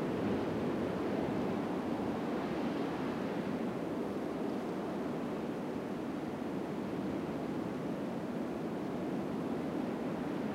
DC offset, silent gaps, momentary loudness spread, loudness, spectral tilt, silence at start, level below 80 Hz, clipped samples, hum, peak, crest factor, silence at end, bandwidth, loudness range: under 0.1%; none; 4 LU; -37 LUFS; -7 dB/octave; 0 s; -64 dBFS; under 0.1%; none; -24 dBFS; 14 dB; 0 s; 16 kHz; 2 LU